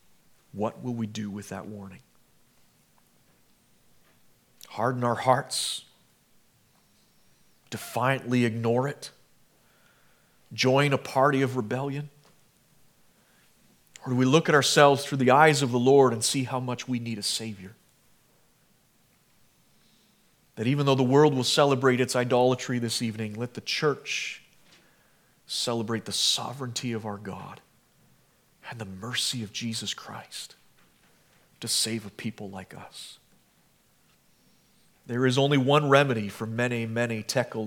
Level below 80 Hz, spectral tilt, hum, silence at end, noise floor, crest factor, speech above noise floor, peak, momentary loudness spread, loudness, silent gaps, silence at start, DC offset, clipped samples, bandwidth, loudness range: -74 dBFS; -4.5 dB/octave; none; 0 s; -64 dBFS; 26 dB; 39 dB; -2 dBFS; 20 LU; -25 LUFS; none; 0.55 s; under 0.1%; under 0.1%; 18 kHz; 13 LU